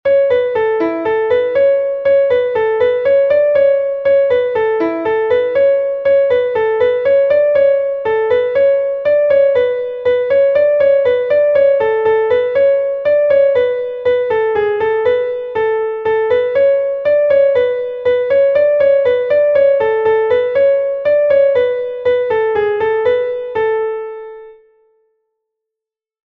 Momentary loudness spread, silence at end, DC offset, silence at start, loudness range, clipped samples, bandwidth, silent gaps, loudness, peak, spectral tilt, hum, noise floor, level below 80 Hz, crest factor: 5 LU; 1.75 s; under 0.1%; 0.05 s; 3 LU; under 0.1%; 4.5 kHz; none; -13 LUFS; -2 dBFS; -6.5 dB/octave; none; -85 dBFS; -52 dBFS; 10 dB